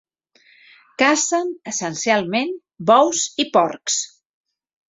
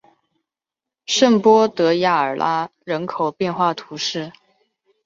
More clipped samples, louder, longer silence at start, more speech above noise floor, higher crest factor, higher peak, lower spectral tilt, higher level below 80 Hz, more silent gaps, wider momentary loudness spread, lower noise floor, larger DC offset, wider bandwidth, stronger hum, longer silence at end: neither; about the same, -19 LUFS vs -18 LUFS; about the same, 1 s vs 1.1 s; second, 38 dB vs 69 dB; about the same, 20 dB vs 18 dB; about the same, -2 dBFS vs -2 dBFS; second, -2.5 dB/octave vs -4 dB/octave; about the same, -66 dBFS vs -64 dBFS; neither; about the same, 10 LU vs 12 LU; second, -57 dBFS vs -87 dBFS; neither; about the same, 8 kHz vs 7.8 kHz; neither; about the same, 0.8 s vs 0.75 s